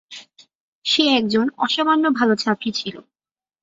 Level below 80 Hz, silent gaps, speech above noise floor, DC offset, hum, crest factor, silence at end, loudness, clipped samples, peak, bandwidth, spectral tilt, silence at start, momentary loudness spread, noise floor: -66 dBFS; 0.55-0.82 s; over 71 dB; under 0.1%; none; 18 dB; 0.6 s; -19 LUFS; under 0.1%; -4 dBFS; 7.8 kHz; -4 dB/octave; 0.1 s; 14 LU; under -90 dBFS